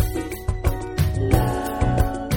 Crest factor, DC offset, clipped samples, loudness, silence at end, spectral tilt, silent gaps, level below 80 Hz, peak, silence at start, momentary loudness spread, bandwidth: 20 dB; under 0.1%; under 0.1%; -23 LUFS; 0 s; -6.5 dB/octave; none; -26 dBFS; -2 dBFS; 0 s; 5 LU; 17.5 kHz